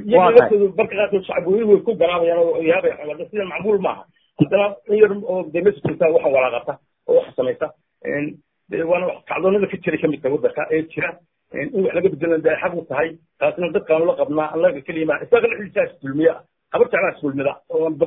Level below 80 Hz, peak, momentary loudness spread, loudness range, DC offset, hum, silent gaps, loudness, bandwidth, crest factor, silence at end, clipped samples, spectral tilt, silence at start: -58 dBFS; 0 dBFS; 10 LU; 3 LU; under 0.1%; none; none; -19 LUFS; 3.9 kHz; 18 dB; 0 s; under 0.1%; -10 dB/octave; 0 s